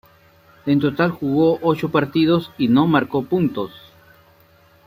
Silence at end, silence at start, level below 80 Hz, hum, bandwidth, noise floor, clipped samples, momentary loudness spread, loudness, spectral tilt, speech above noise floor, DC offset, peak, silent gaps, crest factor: 1.1 s; 0.65 s; -56 dBFS; none; 15.5 kHz; -53 dBFS; under 0.1%; 6 LU; -19 LUFS; -8.5 dB/octave; 35 dB; under 0.1%; -2 dBFS; none; 18 dB